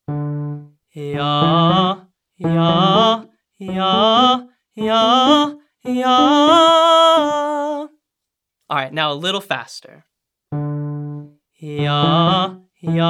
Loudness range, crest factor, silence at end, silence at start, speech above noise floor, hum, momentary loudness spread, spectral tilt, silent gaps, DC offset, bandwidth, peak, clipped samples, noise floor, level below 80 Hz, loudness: 11 LU; 16 dB; 0 s; 0.1 s; 64 dB; none; 18 LU; -5.5 dB/octave; none; under 0.1%; 13.5 kHz; 0 dBFS; under 0.1%; -81 dBFS; -56 dBFS; -15 LUFS